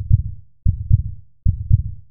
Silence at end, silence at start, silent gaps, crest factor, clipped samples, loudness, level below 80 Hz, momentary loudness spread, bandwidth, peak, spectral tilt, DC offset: 0 s; 0 s; none; 18 dB; under 0.1%; -21 LUFS; -24 dBFS; 8 LU; 0.5 kHz; -2 dBFS; -19.5 dB/octave; 3%